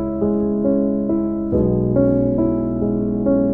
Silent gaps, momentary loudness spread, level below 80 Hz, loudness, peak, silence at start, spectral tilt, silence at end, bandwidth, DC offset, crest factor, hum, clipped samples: none; 4 LU; -36 dBFS; -19 LUFS; -4 dBFS; 0 s; -14 dB/octave; 0 s; 2.4 kHz; under 0.1%; 14 dB; none; under 0.1%